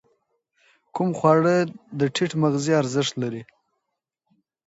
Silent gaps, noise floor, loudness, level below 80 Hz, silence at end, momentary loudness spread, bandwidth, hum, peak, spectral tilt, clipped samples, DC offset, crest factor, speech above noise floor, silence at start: none; -81 dBFS; -22 LUFS; -68 dBFS; 1.25 s; 12 LU; 8 kHz; none; -4 dBFS; -5.5 dB/octave; under 0.1%; under 0.1%; 20 dB; 59 dB; 0.95 s